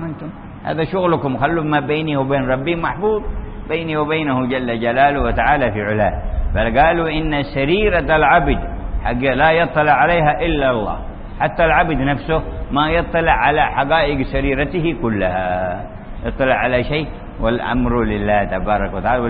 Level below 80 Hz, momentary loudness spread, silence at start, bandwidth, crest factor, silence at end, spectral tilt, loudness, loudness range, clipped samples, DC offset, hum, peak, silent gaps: -28 dBFS; 10 LU; 0 s; 5 kHz; 16 dB; 0 s; -11.5 dB/octave; -17 LUFS; 4 LU; under 0.1%; under 0.1%; none; -2 dBFS; none